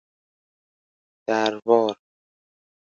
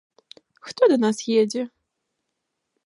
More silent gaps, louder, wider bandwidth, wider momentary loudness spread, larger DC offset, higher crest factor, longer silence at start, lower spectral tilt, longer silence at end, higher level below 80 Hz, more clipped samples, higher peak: neither; about the same, -22 LUFS vs -21 LUFS; second, 7.4 kHz vs 11.5 kHz; second, 15 LU vs 19 LU; neither; about the same, 24 dB vs 20 dB; first, 1.3 s vs 0.65 s; about the same, -4.5 dB/octave vs -4.5 dB/octave; second, 1 s vs 1.2 s; about the same, -76 dBFS vs -80 dBFS; neither; about the same, -2 dBFS vs -4 dBFS